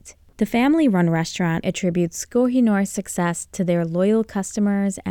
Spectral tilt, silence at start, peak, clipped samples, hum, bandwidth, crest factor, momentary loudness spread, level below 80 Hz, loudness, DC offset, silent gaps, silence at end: -6 dB/octave; 0.05 s; -6 dBFS; under 0.1%; none; 17.5 kHz; 14 dB; 6 LU; -52 dBFS; -21 LUFS; under 0.1%; none; 0 s